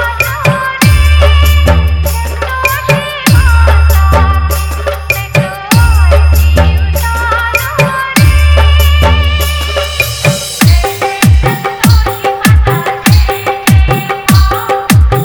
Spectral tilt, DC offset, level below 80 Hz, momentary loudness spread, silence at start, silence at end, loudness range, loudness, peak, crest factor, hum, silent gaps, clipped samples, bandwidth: -5 dB/octave; 0.7%; -10 dBFS; 6 LU; 0 s; 0 s; 1 LU; -9 LUFS; 0 dBFS; 8 dB; none; none; 1%; over 20 kHz